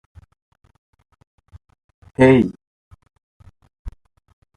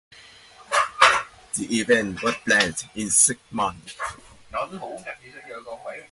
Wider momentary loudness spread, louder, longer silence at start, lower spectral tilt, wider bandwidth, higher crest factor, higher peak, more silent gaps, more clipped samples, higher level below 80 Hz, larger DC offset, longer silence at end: first, 28 LU vs 20 LU; first, -15 LUFS vs -21 LUFS; first, 2.2 s vs 0.6 s; first, -8 dB/octave vs -1.5 dB/octave; second, 9.8 kHz vs 12 kHz; about the same, 22 dB vs 24 dB; about the same, -2 dBFS vs 0 dBFS; first, 2.67-2.91 s, 3.23-3.40 s, 3.79-3.85 s vs none; neither; first, -46 dBFS vs -56 dBFS; neither; first, 0.7 s vs 0.1 s